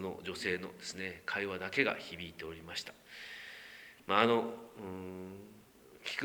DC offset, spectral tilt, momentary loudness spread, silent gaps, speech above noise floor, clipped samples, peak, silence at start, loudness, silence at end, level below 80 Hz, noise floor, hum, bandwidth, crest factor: under 0.1%; -4 dB/octave; 19 LU; none; 22 dB; under 0.1%; -12 dBFS; 0 s; -37 LUFS; 0 s; -70 dBFS; -59 dBFS; none; over 20 kHz; 26 dB